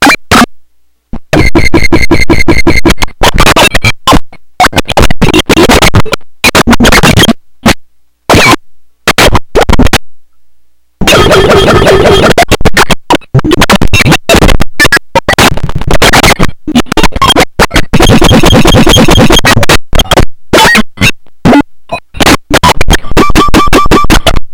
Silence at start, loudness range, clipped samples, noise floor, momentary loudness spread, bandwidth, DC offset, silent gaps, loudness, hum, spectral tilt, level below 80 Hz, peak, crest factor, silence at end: 0 s; 3 LU; 20%; -42 dBFS; 6 LU; over 20 kHz; under 0.1%; none; -5 LUFS; none; -4 dB/octave; -14 dBFS; 0 dBFS; 4 dB; 0 s